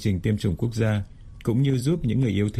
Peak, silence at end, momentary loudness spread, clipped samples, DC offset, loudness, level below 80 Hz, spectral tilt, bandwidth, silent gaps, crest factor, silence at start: -10 dBFS; 0 s; 6 LU; under 0.1%; under 0.1%; -24 LUFS; -42 dBFS; -7.5 dB/octave; 13.5 kHz; none; 14 dB; 0 s